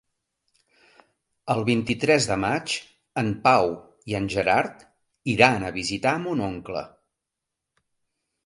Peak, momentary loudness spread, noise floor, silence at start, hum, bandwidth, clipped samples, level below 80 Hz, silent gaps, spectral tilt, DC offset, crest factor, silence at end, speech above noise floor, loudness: 0 dBFS; 15 LU; -84 dBFS; 1.45 s; none; 11.5 kHz; under 0.1%; -54 dBFS; none; -4.5 dB/octave; under 0.1%; 24 dB; 1.6 s; 61 dB; -24 LUFS